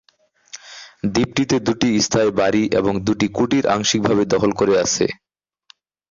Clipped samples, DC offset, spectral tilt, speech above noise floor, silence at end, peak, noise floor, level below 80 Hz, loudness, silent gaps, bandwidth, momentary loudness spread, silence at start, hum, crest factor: under 0.1%; under 0.1%; -4.5 dB/octave; 41 dB; 1 s; -2 dBFS; -58 dBFS; -48 dBFS; -18 LUFS; none; 7.6 kHz; 19 LU; 0.55 s; none; 16 dB